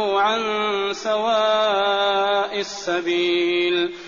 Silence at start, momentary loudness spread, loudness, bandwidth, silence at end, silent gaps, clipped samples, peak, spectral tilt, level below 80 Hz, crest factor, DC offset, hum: 0 s; 5 LU; -20 LUFS; 7.2 kHz; 0 s; none; under 0.1%; -8 dBFS; -0.5 dB/octave; -64 dBFS; 12 dB; 0.1%; none